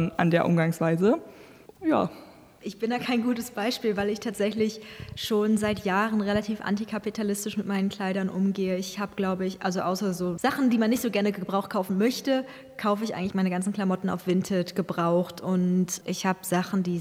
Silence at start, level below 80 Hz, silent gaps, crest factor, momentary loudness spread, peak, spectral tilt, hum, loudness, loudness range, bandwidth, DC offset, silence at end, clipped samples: 0 s; -60 dBFS; none; 20 dB; 6 LU; -8 dBFS; -6 dB/octave; none; -27 LUFS; 2 LU; 16 kHz; under 0.1%; 0 s; under 0.1%